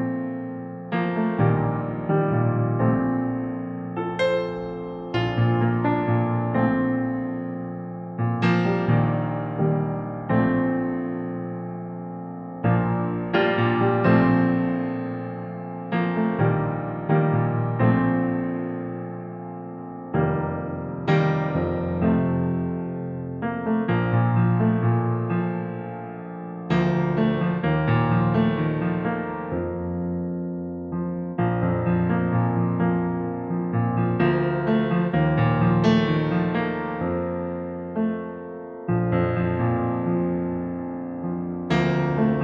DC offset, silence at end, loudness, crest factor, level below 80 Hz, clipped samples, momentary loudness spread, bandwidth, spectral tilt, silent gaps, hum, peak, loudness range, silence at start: under 0.1%; 0 s; -24 LUFS; 18 dB; -50 dBFS; under 0.1%; 11 LU; 6.6 kHz; -9.5 dB/octave; none; none; -6 dBFS; 4 LU; 0 s